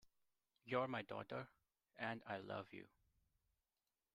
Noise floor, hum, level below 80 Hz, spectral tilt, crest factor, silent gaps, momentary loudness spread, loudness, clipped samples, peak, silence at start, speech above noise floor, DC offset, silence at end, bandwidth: under -90 dBFS; none; -86 dBFS; -7 dB/octave; 22 dB; none; 17 LU; -48 LUFS; under 0.1%; -28 dBFS; 0.05 s; over 43 dB; under 0.1%; 1.25 s; 15.5 kHz